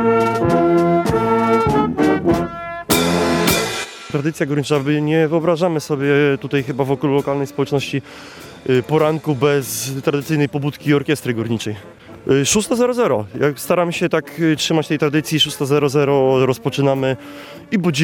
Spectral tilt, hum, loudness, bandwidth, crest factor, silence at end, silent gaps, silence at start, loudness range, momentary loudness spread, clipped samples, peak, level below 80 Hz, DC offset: -5 dB/octave; none; -17 LUFS; 17.5 kHz; 16 dB; 0 s; none; 0 s; 3 LU; 8 LU; under 0.1%; 0 dBFS; -46 dBFS; under 0.1%